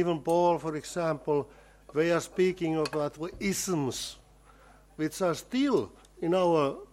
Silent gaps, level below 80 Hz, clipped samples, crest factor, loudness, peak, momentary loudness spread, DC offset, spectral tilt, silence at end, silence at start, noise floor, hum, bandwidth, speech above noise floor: none; -58 dBFS; under 0.1%; 16 dB; -29 LUFS; -14 dBFS; 10 LU; under 0.1%; -5 dB/octave; 0.05 s; 0 s; -57 dBFS; 50 Hz at -55 dBFS; 16.5 kHz; 28 dB